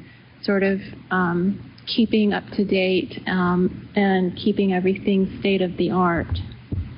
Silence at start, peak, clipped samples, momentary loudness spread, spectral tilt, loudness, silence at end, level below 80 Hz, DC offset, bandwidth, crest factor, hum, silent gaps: 0 s; -8 dBFS; under 0.1%; 8 LU; -5 dB/octave; -22 LUFS; 0 s; -44 dBFS; under 0.1%; 5.6 kHz; 12 dB; none; none